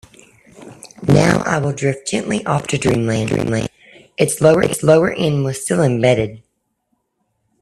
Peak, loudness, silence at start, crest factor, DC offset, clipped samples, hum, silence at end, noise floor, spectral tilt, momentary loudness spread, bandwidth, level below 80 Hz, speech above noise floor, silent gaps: 0 dBFS; -16 LUFS; 0.6 s; 18 dB; under 0.1%; under 0.1%; none; 1.25 s; -69 dBFS; -5.5 dB/octave; 9 LU; 13.5 kHz; -46 dBFS; 53 dB; none